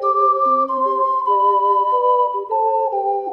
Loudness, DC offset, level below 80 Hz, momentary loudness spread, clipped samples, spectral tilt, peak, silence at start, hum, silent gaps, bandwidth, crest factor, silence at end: -17 LUFS; under 0.1%; -72 dBFS; 4 LU; under 0.1%; -6 dB/octave; -6 dBFS; 0 s; none; none; 5.4 kHz; 10 dB; 0 s